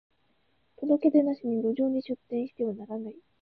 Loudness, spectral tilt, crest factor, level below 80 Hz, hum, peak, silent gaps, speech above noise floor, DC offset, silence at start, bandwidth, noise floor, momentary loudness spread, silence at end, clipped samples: -28 LUFS; -10.5 dB/octave; 18 dB; -74 dBFS; none; -12 dBFS; none; 44 dB; under 0.1%; 0.8 s; 4.9 kHz; -72 dBFS; 14 LU; 0.2 s; under 0.1%